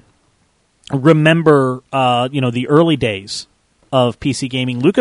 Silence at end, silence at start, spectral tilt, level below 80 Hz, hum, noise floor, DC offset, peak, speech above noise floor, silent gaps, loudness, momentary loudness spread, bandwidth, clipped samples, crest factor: 0 s; 0.9 s; -6 dB/octave; -48 dBFS; none; -59 dBFS; under 0.1%; 0 dBFS; 45 dB; none; -15 LUFS; 10 LU; 11 kHz; under 0.1%; 16 dB